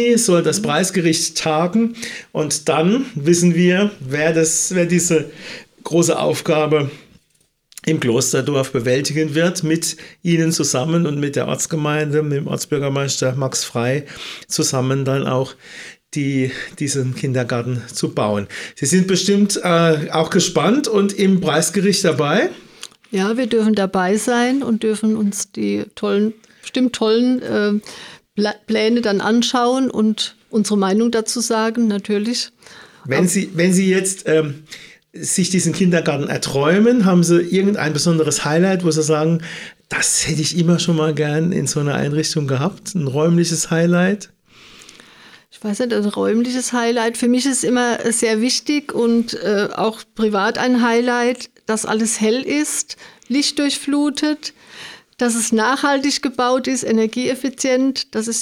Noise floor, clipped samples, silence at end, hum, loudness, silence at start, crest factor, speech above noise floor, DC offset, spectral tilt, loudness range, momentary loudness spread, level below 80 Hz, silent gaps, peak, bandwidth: -62 dBFS; under 0.1%; 0 s; none; -17 LUFS; 0 s; 16 dB; 45 dB; under 0.1%; -4.5 dB/octave; 4 LU; 8 LU; -58 dBFS; none; -2 dBFS; 16 kHz